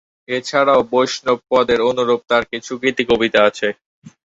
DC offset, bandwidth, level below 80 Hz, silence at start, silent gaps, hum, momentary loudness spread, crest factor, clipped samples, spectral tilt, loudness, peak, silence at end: under 0.1%; 7.8 kHz; -52 dBFS; 0.3 s; 3.86-4.02 s; none; 9 LU; 16 dB; under 0.1%; -4 dB/octave; -17 LUFS; -2 dBFS; 0.15 s